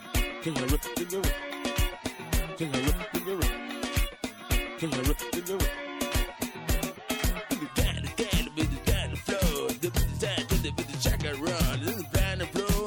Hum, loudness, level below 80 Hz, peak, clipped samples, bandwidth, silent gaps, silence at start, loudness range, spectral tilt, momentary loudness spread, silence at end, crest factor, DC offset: none; -30 LUFS; -34 dBFS; -14 dBFS; under 0.1%; 18 kHz; none; 0 s; 2 LU; -4.5 dB/octave; 4 LU; 0 s; 16 dB; under 0.1%